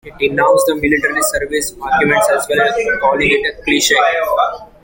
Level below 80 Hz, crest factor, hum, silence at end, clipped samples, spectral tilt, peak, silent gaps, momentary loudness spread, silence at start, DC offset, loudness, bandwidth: -40 dBFS; 14 dB; none; 0.2 s; under 0.1%; -2.5 dB/octave; 0 dBFS; none; 5 LU; 0.05 s; under 0.1%; -14 LUFS; 17 kHz